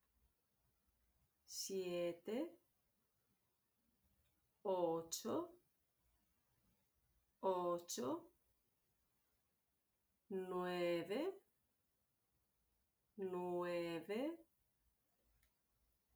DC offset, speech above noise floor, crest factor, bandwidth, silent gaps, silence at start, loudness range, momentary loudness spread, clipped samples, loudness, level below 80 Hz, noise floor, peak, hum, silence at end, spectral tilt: under 0.1%; 43 dB; 20 dB; over 20 kHz; none; 1.5 s; 2 LU; 9 LU; under 0.1%; -45 LUFS; -86 dBFS; -86 dBFS; -28 dBFS; none; 1.75 s; -4.5 dB/octave